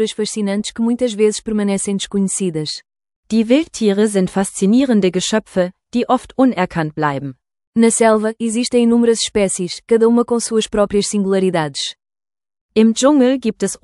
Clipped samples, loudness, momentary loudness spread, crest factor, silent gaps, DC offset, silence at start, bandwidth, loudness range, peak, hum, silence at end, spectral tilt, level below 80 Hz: under 0.1%; -16 LUFS; 8 LU; 16 dB; 3.16-3.23 s, 7.67-7.73 s, 12.61-12.69 s; under 0.1%; 0 s; 12 kHz; 3 LU; 0 dBFS; none; 0.1 s; -4.5 dB/octave; -50 dBFS